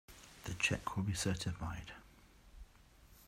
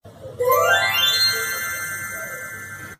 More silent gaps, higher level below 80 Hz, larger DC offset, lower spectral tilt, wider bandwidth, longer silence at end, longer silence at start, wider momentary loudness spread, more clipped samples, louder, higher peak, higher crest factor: neither; about the same, -58 dBFS vs -58 dBFS; neither; first, -4 dB/octave vs -0.5 dB/octave; about the same, 16 kHz vs 15.5 kHz; about the same, 0 s vs 0.05 s; about the same, 0.1 s vs 0.05 s; first, 19 LU vs 16 LU; neither; second, -39 LUFS vs -19 LUFS; second, -20 dBFS vs -6 dBFS; about the same, 22 dB vs 18 dB